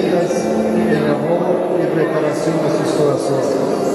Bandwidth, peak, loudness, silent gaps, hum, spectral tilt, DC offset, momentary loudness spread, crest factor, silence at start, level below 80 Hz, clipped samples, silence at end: 13 kHz; -4 dBFS; -17 LUFS; none; none; -6.5 dB/octave; under 0.1%; 2 LU; 12 dB; 0 s; -56 dBFS; under 0.1%; 0 s